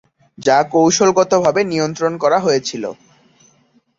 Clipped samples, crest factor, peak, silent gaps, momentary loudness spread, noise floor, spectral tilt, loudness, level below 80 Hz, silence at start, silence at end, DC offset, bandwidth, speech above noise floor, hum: under 0.1%; 16 dB; -2 dBFS; none; 10 LU; -56 dBFS; -4 dB/octave; -15 LUFS; -58 dBFS; 0.4 s; 1.05 s; under 0.1%; 7.8 kHz; 42 dB; none